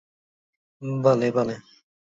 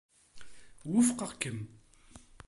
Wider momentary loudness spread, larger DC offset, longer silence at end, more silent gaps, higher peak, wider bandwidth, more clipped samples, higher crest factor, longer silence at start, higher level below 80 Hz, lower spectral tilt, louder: second, 17 LU vs 20 LU; neither; first, 0.6 s vs 0.25 s; neither; first, -6 dBFS vs -14 dBFS; second, 7.8 kHz vs 11.5 kHz; neither; about the same, 22 dB vs 22 dB; first, 0.8 s vs 0.35 s; about the same, -66 dBFS vs -64 dBFS; first, -7.5 dB/octave vs -4.5 dB/octave; first, -23 LUFS vs -31 LUFS